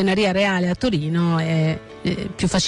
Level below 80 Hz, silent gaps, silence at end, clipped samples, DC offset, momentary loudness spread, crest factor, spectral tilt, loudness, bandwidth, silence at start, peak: -44 dBFS; none; 0 s; under 0.1%; under 0.1%; 7 LU; 10 dB; -5.5 dB/octave; -21 LUFS; 11 kHz; 0 s; -10 dBFS